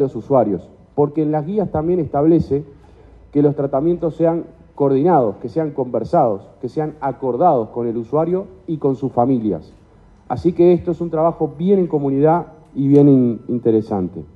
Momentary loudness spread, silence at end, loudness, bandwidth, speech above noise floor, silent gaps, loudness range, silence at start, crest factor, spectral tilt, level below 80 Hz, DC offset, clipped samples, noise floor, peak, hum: 9 LU; 0.1 s; -18 LUFS; 5.6 kHz; 31 dB; none; 3 LU; 0 s; 16 dB; -11 dB/octave; -48 dBFS; under 0.1%; under 0.1%; -47 dBFS; -2 dBFS; none